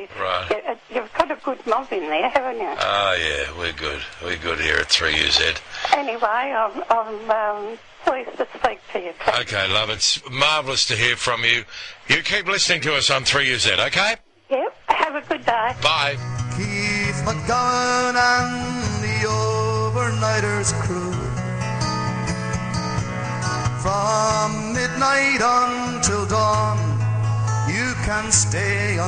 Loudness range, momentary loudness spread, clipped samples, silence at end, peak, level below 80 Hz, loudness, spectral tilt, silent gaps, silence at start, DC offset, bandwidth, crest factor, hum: 4 LU; 9 LU; under 0.1%; 0 s; 0 dBFS; -42 dBFS; -20 LUFS; -3 dB/octave; none; 0 s; under 0.1%; 9.8 kHz; 22 dB; none